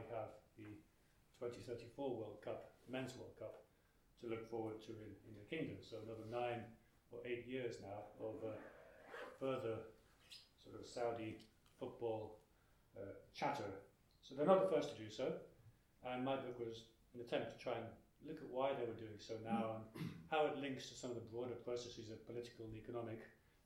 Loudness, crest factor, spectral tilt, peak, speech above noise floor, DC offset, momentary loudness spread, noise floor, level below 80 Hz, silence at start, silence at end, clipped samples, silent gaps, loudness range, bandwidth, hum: -47 LUFS; 28 dB; -6 dB/octave; -20 dBFS; 29 dB; under 0.1%; 17 LU; -75 dBFS; -76 dBFS; 0 s; 0.3 s; under 0.1%; none; 8 LU; 16.5 kHz; none